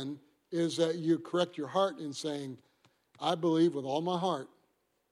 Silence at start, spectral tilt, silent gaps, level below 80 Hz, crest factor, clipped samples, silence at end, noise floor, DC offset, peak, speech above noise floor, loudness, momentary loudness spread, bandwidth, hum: 0 s; -5.5 dB/octave; none; -82 dBFS; 18 dB; under 0.1%; 0.65 s; -75 dBFS; under 0.1%; -16 dBFS; 44 dB; -32 LUFS; 13 LU; 11.5 kHz; none